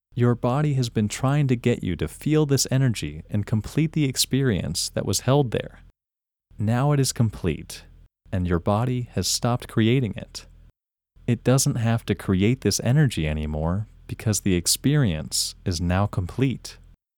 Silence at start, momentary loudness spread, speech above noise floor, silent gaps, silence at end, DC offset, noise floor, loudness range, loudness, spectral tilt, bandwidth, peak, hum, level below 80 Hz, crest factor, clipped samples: 0.15 s; 10 LU; 67 dB; none; 0.45 s; under 0.1%; -89 dBFS; 2 LU; -23 LUFS; -5 dB/octave; 19 kHz; -6 dBFS; none; -42 dBFS; 18 dB; under 0.1%